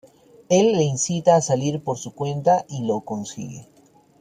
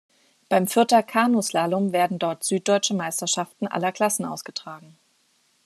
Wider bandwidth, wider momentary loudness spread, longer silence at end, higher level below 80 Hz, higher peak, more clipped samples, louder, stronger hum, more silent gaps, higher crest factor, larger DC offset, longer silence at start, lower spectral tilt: second, 11 kHz vs 14 kHz; about the same, 15 LU vs 13 LU; second, 0.55 s vs 0.85 s; first, -62 dBFS vs -76 dBFS; about the same, -2 dBFS vs -4 dBFS; neither; about the same, -21 LUFS vs -23 LUFS; neither; neither; about the same, 20 dB vs 20 dB; neither; about the same, 0.5 s vs 0.5 s; first, -5.5 dB/octave vs -3.5 dB/octave